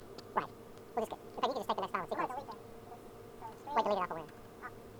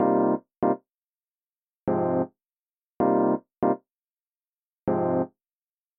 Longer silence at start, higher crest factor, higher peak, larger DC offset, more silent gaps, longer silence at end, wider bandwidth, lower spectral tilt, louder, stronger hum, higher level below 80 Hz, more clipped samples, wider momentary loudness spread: about the same, 0 s vs 0 s; about the same, 22 dB vs 18 dB; second, -16 dBFS vs -10 dBFS; neither; second, none vs 0.57-0.61 s, 0.90-1.24 s, 1.30-1.84 s, 2.52-2.98 s, 4.04-4.17 s, 4.24-4.87 s; second, 0 s vs 0.7 s; first, over 20 kHz vs 3.1 kHz; second, -5 dB/octave vs -10.5 dB/octave; second, -38 LUFS vs -26 LUFS; neither; about the same, -66 dBFS vs -62 dBFS; neither; first, 17 LU vs 11 LU